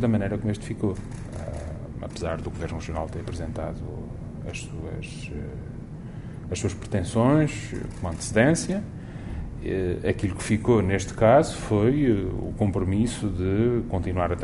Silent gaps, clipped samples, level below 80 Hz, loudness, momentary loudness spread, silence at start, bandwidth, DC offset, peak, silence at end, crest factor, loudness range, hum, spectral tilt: none; under 0.1%; -40 dBFS; -26 LUFS; 15 LU; 0 s; 11.5 kHz; under 0.1%; -6 dBFS; 0 s; 20 dB; 11 LU; none; -6.5 dB/octave